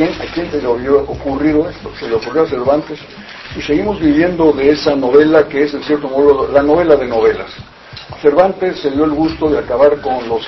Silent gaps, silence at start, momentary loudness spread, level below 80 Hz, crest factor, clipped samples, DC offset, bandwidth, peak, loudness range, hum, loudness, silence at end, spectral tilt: none; 0 s; 15 LU; -38 dBFS; 14 dB; 0.1%; under 0.1%; 6 kHz; 0 dBFS; 5 LU; none; -13 LUFS; 0 s; -7 dB/octave